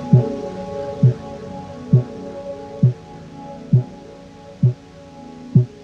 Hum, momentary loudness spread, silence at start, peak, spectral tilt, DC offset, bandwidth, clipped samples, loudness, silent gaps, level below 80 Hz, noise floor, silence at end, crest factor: none; 21 LU; 0 s; 0 dBFS; -10 dB/octave; under 0.1%; 6.6 kHz; under 0.1%; -20 LUFS; none; -50 dBFS; -40 dBFS; 0 s; 20 dB